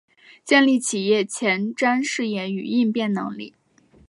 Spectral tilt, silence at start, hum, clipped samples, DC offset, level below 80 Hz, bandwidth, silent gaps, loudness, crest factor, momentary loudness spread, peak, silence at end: -4 dB/octave; 0.45 s; none; under 0.1%; under 0.1%; -70 dBFS; 11.5 kHz; none; -21 LUFS; 18 dB; 14 LU; -4 dBFS; 0.6 s